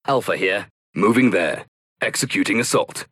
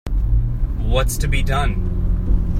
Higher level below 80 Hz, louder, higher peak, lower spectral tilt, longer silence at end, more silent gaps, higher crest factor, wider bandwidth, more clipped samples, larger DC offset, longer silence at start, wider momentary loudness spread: second, -62 dBFS vs -18 dBFS; about the same, -20 LUFS vs -21 LUFS; about the same, -6 dBFS vs -6 dBFS; second, -4 dB/octave vs -5.5 dB/octave; about the same, 0.1 s vs 0 s; first, 0.70-0.93 s, 1.68-1.96 s vs none; about the same, 16 dB vs 12 dB; second, 14.5 kHz vs 16 kHz; neither; neither; about the same, 0.05 s vs 0.05 s; first, 9 LU vs 3 LU